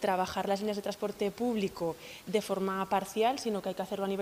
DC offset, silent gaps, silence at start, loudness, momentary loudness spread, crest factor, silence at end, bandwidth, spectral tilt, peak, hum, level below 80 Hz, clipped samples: under 0.1%; none; 0 s; -33 LUFS; 6 LU; 16 dB; 0 s; 15.5 kHz; -5 dB/octave; -16 dBFS; none; -64 dBFS; under 0.1%